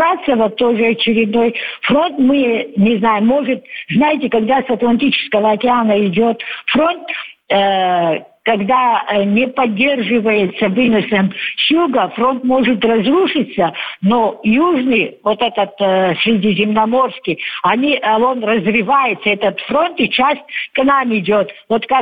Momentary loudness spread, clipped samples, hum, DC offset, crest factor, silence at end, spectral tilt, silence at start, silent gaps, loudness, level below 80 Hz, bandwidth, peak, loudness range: 5 LU; under 0.1%; none; 0.1%; 12 dB; 0 s; -8 dB/octave; 0 s; none; -14 LUFS; -52 dBFS; 5 kHz; -2 dBFS; 1 LU